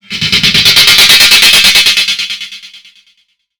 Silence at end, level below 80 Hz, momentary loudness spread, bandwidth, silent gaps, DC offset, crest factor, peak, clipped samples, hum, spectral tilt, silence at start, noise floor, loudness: 0.8 s; -38 dBFS; 14 LU; over 20 kHz; none; under 0.1%; 8 dB; 0 dBFS; 6%; none; 0 dB/octave; 0.1 s; -55 dBFS; -3 LUFS